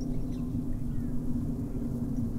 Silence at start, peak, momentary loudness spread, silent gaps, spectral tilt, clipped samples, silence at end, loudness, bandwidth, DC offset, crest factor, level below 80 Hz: 0 s; -18 dBFS; 2 LU; none; -9.5 dB/octave; under 0.1%; 0 s; -34 LUFS; 15 kHz; under 0.1%; 12 dB; -38 dBFS